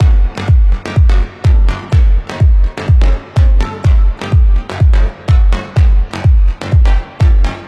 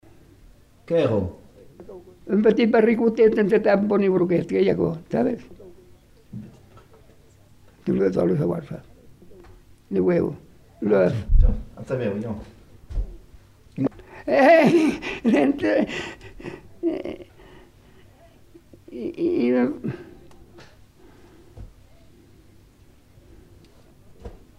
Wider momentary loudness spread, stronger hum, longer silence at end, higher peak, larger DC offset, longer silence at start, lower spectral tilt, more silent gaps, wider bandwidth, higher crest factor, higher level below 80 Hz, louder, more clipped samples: second, 2 LU vs 21 LU; neither; second, 0 s vs 0.25 s; first, 0 dBFS vs -4 dBFS; neither; second, 0 s vs 0.9 s; about the same, -7.5 dB/octave vs -8 dB/octave; neither; second, 6.8 kHz vs 12.5 kHz; second, 8 dB vs 18 dB; first, -10 dBFS vs -34 dBFS; first, -12 LUFS vs -22 LUFS; neither